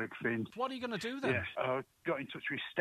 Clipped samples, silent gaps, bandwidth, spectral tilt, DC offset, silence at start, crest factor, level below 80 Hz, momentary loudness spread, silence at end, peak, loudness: under 0.1%; none; 14 kHz; -5.5 dB/octave; under 0.1%; 0 s; 20 dB; -70 dBFS; 4 LU; 0 s; -16 dBFS; -37 LUFS